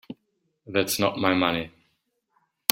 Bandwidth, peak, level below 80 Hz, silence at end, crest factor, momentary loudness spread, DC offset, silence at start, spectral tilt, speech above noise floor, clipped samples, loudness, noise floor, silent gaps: 16.5 kHz; 0 dBFS; -62 dBFS; 1.05 s; 28 dB; 20 LU; under 0.1%; 0.1 s; -3.5 dB/octave; 50 dB; under 0.1%; -25 LUFS; -74 dBFS; none